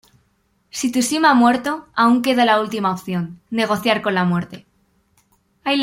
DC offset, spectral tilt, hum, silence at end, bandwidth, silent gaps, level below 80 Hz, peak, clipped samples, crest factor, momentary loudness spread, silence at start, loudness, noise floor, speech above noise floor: under 0.1%; -4.5 dB/octave; none; 0 s; 16.5 kHz; none; -60 dBFS; -2 dBFS; under 0.1%; 18 dB; 11 LU; 0.75 s; -18 LUFS; -64 dBFS; 46 dB